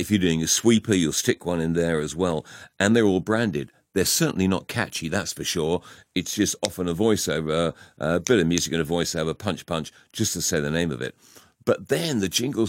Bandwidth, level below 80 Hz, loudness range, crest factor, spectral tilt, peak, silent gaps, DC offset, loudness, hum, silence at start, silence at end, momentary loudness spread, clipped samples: 16.5 kHz; -50 dBFS; 4 LU; 20 dB; -4 dB/octave; -4 dBFS; none; under 0.1%; -24 LUFS; none; 0 s; 0 s; 10 LU; under 0.1%